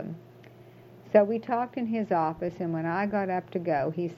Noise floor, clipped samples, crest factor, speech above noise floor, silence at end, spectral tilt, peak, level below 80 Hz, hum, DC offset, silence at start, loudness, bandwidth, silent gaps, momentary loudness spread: -51 dBFS; under 0.1%; 22 dB; 24 dB; 0 s; -9 dB/octave; -6 dBFS; -66 dBFS; none; under 0.1%; 0 s; -28 LUFS; 6.6 kHz; none; 8 LU